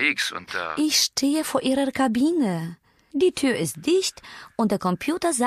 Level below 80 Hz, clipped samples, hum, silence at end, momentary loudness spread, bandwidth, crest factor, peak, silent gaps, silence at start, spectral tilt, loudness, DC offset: -60 dBFS; under 0.1%; none; 0 s; 10 LU; 15 kHz; 16 dB; -8 dBFS; none; 0 s; -3.5 dB/octave; -23 LUFS; under 0.1%